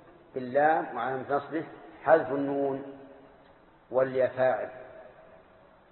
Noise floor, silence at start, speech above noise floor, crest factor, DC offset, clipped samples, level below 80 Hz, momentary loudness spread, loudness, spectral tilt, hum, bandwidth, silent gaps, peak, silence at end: -57 dBFS; 0.35 s; 30 dB; 22 dB; under 0.1%; under 0.1%; -70 dBFS; 19 LU; -28 LUFS; -10 dB/octave; none; 4.3 kHz; none; -8 dBFS; 0.85 s